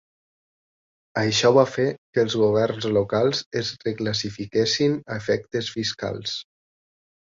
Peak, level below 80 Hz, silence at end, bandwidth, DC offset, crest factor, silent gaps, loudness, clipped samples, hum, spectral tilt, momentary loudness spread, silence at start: -4 dBFS; -58 dBFS; 0.95 s; 7.6 kHz; under 0.1%; 20 dB; 1.98-2.13 s, 3.46-3.51 s; -23 LUFS; under 0.1%; none; -4.5 dB/octave; 10 LU; 1.15 s